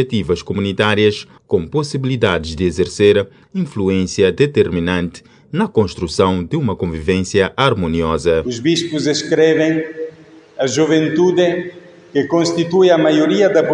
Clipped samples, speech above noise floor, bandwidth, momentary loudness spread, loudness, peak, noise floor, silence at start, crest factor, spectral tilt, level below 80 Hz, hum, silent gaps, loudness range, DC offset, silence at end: under 0.1%; 26 dB; 10.5 kHz; 9 LU; -16 LUFS; 0 dBFS; -41 dBFS; 0 s; 16 dB; -5.5 dB/octave; -44 dBFS; none; none; 2 LU; under 0.1%; 0 s